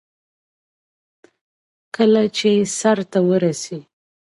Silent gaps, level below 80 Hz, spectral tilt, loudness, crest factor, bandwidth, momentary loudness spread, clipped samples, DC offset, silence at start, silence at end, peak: none; -68 dBFS; -5 dB/octave; -18 LUFS; 18 dB; 11.5 kHz; 15 LU; under 0.1%; under 0.1%; 2 s; 0.4 s; -4 dBFS